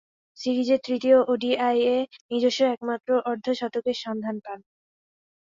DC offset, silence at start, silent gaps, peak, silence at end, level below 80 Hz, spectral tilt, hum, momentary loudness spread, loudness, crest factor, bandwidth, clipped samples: under 0.1%; 0.4 s; 2.21-2.29 s; -8 dBFS; 1 s; -72 dBFS; -4.5 dB/octave; none; 12 LU; -24 LUFS; 18 dB; 7.6 kHz; under 0.1%